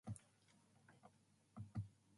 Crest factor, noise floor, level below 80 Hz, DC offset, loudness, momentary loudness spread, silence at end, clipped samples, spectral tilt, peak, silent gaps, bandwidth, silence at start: 20 dB; -75 dBFS; -72 dBFS; under 0.1%; -55 LUFS; 17 LU; 0 s; under 0.1%; -7 dB/octave; -36 dBFS; none; 11.5 kHz; 0.05 s